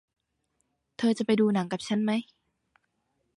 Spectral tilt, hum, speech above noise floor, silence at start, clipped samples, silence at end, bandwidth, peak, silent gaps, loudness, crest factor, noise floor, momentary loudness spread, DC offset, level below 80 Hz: -6 dB/octave; none; 51 dB; 1 s; under 0.1%; 1.15 s; 11.5 kHz; -14 dBFS; none; -27 LUFS; 16 dB; -77 dBFS; 6 LU; under 0.1%; -72 dBFS